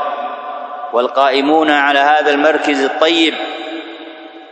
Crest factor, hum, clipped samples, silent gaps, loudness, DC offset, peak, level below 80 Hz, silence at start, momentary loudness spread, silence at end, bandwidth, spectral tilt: 14 dB; none; under 0.1%; none; -13 LUFS; under 0.1%; 0 dBFS; -66 dBFS; 0 s; 16 LU; 0 s; 9 kHz; -2.5 dB/octave